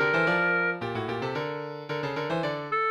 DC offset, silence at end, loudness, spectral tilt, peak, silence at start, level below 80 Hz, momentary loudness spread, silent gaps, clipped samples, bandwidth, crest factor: under 0.1%; 0 s; -28 LUFS; -6.5 dB/octave; -12 dBFS; 0 s; -64 dBFS; 10 LU; none; under 0.1%; 12.5 kHz; 16 dB